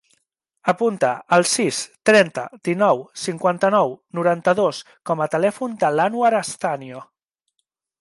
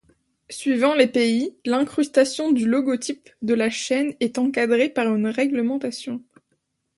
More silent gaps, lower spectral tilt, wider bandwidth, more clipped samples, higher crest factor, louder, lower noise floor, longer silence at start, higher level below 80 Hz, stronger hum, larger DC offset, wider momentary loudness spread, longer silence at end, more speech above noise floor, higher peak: neither; about the same, -4 dB/octave vs -4 dB/octave; about the same, 11.5 kHz vs 11.5 kHz; neither; about the same, 18 dB vs 20 dB; about the same, -20 LUFS vs -22 LUFS; first, -76 dBFS vs -72 dBFS; first, 0.65 s vs 0.5 s; about the same, -70 dBFS vs -66 dBFS; neither; neither; about the same, 10 LU vs 11 LU; first, 1 s vs 0.8 s; first, 57 dB vs 51 dB; about the same, -4 dBFS vs -2 dBFS